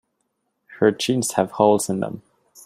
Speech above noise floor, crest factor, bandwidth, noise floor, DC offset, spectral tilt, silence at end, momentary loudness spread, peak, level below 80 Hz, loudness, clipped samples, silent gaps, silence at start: 54 dB; 20 dB; 16 kHz; -73 dBFS; under 0.1%; -4.5 dB/octave; 0.45 s; 11 LU; -2 dBFS; -64 dBFS; -20 LUFS; under 0.1%; none; 0.7 s